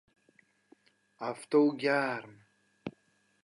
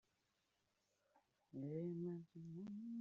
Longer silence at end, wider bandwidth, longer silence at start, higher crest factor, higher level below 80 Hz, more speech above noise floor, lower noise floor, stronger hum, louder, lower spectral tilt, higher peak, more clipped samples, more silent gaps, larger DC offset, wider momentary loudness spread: first, 0.55 s vs 0 s; first, 11.5 kHz vs 7 kHz; about the same, 1.2 s vs 1.15 s; about the same, 18 dB vs 16 dB; first, -80 dBFS vs -90 dBFS; first, 42 dB vs 37 dB; second, -72 dBFS vs -86 dBFS; neither; first, -30 LUFS vs -50 LUFS; second, -6 dB/octave vs -11 dB/octave; first, -16 dBFS vs -36 dBFS; neither; neither; neither; first, 19 LU vs 8 LU